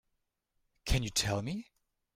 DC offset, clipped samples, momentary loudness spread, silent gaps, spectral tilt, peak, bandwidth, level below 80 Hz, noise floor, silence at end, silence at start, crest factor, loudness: under 0.1%; under 0.1%; 12 LU; none; -3.5 dB/octave; -16 dBFS; 16 kHz; -44 dBFS; -82 dBFS; 0.55 s; 0.85 s; 20 dB; -34 LUFS